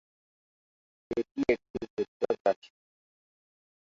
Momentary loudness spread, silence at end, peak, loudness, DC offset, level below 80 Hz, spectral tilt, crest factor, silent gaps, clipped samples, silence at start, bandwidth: 7 LU; 1.3 s; -12 dBFS; -32 LUFS; under 0.1%; -64 dBFS; -6.5 dB/octave; 22 dB; 1.31-1.35 s, 1.70-1.74 s, 1.90-1.97 s, 2.08-2.20 s, 2.40-2.45 s, 2.56-2.62 s; under 0.1%; 1.1 s; 7.6 kHz